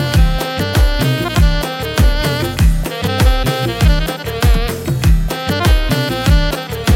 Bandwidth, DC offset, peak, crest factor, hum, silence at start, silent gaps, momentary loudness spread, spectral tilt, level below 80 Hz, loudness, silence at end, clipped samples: 17 kHz; under 0.1%; 0 dBFS; 12 dB; none; 0 s; none; 4 LU; -5.5 dB/octave; -16 dBFS; -15 LUFS; 0 s; under 0.1%